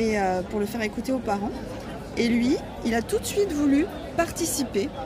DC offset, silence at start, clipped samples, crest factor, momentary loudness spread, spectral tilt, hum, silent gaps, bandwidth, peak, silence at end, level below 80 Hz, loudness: under 0.1%; 0 s; under 0.1%; 16 dB; 8 LU; -4.5 dB/octave; none; none; 16 kHz; -10 dBFS; 0 s; -44 dBFS; -26 LUFS